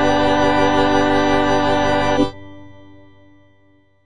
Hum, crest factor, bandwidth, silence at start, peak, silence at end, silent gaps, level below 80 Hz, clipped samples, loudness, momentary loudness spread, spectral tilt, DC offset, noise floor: none; 14 dB; 9.4 kHz; 0 s; -4 dBFS; 0 s; none; -38 dBFS; under 0.1%; -16 LUFS; 3 LU; -5 dB/octave; under 0.1%; -56 dBFS